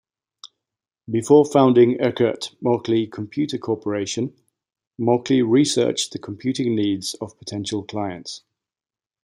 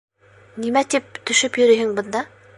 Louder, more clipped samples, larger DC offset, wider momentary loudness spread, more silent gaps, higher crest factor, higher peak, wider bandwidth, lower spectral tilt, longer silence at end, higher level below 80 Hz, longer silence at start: about the same, -21 LUFS vs -19 LUFS; neither; neither; about the same, 14 LU vs 12 LU; first, 4.87-4.91 s vs none; about the same, 20 dB vs 16 dB; about the same, -2 dBFS vs -4 dBFS; first, 15 kHz vs 11.5 kHz; first, -5.5 dB/octave vs -2 dB/octave; first, 0.85 s vs 0.3 s; about the same, -66 dBFS vs -66 dBFS; about the same, 0.45 s vs 0.55 s